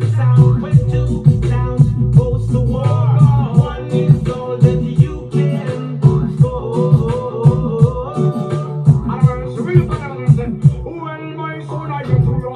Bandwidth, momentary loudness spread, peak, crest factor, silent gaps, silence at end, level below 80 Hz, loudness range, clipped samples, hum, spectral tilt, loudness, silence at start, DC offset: 9.6 kHz; 10 LU; 0 dBFS; 14 dB; none; 0 s; -30 dBFS; 3 LU; 0.3%; none; -9.5 dB/octave; -15 LUFS; 0 s; under 0.1%